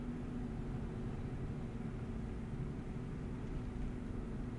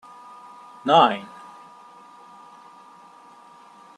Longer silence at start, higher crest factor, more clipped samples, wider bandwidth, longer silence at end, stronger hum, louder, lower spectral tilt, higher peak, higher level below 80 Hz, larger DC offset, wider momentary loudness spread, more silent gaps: second, 0 s vs 0.85 s; second, 12 dB vs 24 dB; neither; about the same, 11 kHz vs 10.5 kHz; second, 0 s vs 2.75 s; neither; second, -44 LUFS vs -19 LUFS; first, -8.5 dB/octave vs -5 dB/octave; second, -30 dBFS vs -2 dBFS; first, -48 dBFS vs -78 dBFS; neither; second, 1 LU vs 29 LU; neither